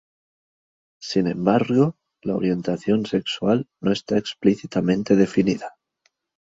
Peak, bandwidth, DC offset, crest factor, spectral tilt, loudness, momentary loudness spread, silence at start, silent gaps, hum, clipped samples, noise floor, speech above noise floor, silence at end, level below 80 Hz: -4 dBFS; 8 kHz; under 0.1%; 18 dB; -7 dB/octave; -22 LUFS; 7 LU; 1 s; none; none; under 0.1%; -69 dBFS; 48 dB; 0.8 s; -58 dBFS